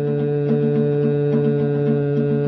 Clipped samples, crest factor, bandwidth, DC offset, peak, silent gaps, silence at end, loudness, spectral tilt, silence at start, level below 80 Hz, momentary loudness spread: under 0.1%; 12 dB; 4.8 kHz; under 0.1%; -8 dBFS; none; 0 s; -19 LUFS; -12 dB/octave; 0 s; -54 dBFS; 1 LU